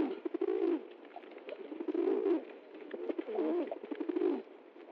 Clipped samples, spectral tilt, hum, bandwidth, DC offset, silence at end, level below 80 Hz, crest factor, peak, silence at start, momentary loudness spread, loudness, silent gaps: under 0.1%; -3.5 dB/octave; none; 4.9 kHz; under 0.1%; 0 s; under -90 dBFS; 14 dB; -22 dBFS; 0 s; 17 LU; -36 LUFS; none